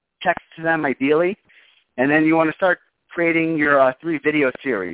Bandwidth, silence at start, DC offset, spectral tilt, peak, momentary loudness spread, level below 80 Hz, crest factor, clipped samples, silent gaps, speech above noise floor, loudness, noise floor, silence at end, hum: 4 kHz; 0.2 s; under 0.1%; -9.5 dB/octave; -2 dBFS; 9 LU; -60 dBFS; 16 dB; under 0.1%; none; 32 dB; -19 LUFS; -51 dBFS; 0 s; none